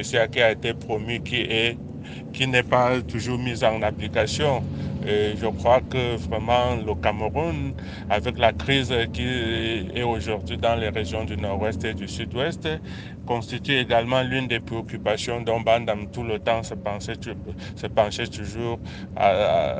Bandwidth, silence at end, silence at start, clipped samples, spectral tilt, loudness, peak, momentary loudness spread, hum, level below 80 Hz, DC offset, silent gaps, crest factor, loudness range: 9.8 kHz; 0 s; 0 s; under 0.1%; -5.5 dB/octave; -24 LUFS; -2 dBFS; 10 LU; none; -44 dBFS; under 0.1%; none; 22 dB; 3 LU